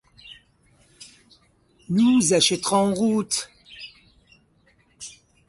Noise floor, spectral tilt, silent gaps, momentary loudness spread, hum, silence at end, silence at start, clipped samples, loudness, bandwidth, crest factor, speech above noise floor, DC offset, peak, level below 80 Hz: -61 dBFS; -3.5 dB/octave; none; 24 LU; none; 0.4 s; 0.25 s; under 0.1%; -20 LUFS; 11.5 kHz; 20 dB; 41 dB; under 0.1%; -6 dBFS; -62 dBFS